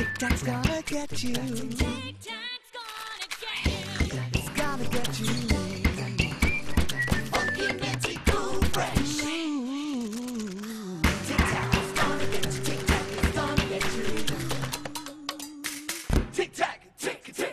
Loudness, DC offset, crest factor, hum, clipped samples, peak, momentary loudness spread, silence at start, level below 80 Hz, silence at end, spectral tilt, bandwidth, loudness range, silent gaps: -29 LUFS; under 0.1%; 20 dB; none; under 0.1%; -6 dBFS; 9 LU; 0 s; -36 dBFS; 0 s; -4.5 dB/octave; 14.5 kHz; 4 LU; none